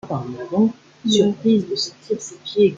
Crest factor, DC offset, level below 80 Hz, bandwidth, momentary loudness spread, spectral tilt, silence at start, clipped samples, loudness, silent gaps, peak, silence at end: 16 dB; under 0.1%; -62 dBFS; 7.8 kHz; 10 LU; -5.5 dB/octave; 0.05 s; under 0.1%; -21 LUFS; none; -4 dBFS; 0 s